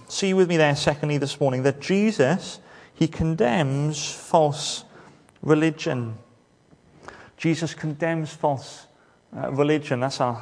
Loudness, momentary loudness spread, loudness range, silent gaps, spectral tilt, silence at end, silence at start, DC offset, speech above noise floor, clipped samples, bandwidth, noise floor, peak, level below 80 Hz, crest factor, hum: -23 LUFS; 14 LU; 6 LU; none; -5.5 dB/octave; 0 s; 0 s; under 0.1%; 35 dB; under 0.1%; 10.5 kHz; -57 dBFS; -4 dBFS; -52 dBFS; 20 dB; none